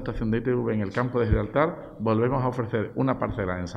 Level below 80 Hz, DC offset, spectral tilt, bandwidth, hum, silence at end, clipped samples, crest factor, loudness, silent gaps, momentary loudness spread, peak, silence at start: -40 dBFS; under 0.1%; -8.5 dB/octave; 7.8 kHz; none; 0 s; under 0.1%; 18 dB; -26 LUFS; none; 5 LU; -8 dBFS; 0 s